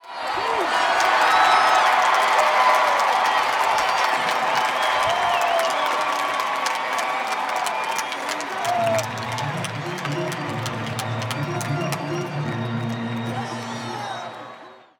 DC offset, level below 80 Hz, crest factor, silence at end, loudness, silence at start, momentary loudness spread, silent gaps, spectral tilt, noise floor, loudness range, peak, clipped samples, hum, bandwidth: under 0.1%; -64 dBFS; 18 dB; 0.25 s; -21 LUFS; 0.05 s; 11 LU; none; -3.5 dB/octave; -43 dBFS; 9 LU; -4 dBFS; under 0.1%; none; over 20 kHz